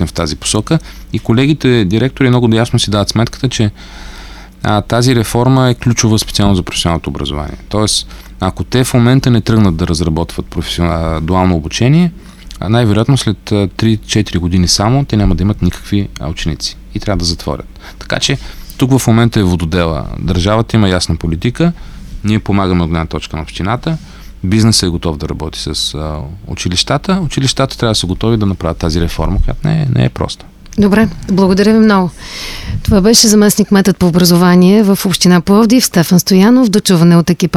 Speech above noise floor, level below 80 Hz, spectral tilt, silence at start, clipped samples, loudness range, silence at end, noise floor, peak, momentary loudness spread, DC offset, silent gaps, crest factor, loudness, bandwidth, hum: 19 dB; -26 dBFS; -5 dB/octave; 0 s; under 0.1%; 7 LU; 0 s; -31 dBFS; 0 dBFS; 12 LU; under 0.1%; none; 12 dB; -12 LUFS; 16 kHz; none